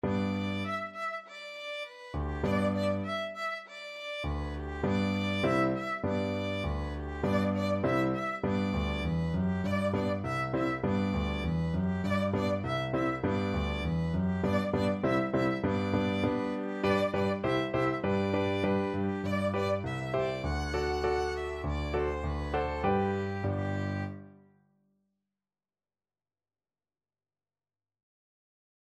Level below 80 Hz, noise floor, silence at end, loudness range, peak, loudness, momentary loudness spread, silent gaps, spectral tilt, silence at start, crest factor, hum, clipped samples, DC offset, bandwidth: -44 dBFS; under -90 dBFS; 4.6 s; 4 LU; -16 dBFS; -31 LUFS; 7 LU; none; -7 dB/octave; 0.05 s; 16 dB; none; under 0.1%; under 0.1%; 12.5 kHz